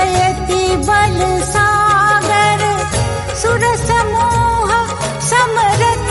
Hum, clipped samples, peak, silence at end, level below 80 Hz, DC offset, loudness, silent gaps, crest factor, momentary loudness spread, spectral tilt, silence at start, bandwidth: none; under 0.1%; -2 dBFS; 0 s; -28 dBFS; under 0.1%; -13 LUFS; none; 12 dB; 5 LU; -4 dB/octave; 0 s; 11.5 kHz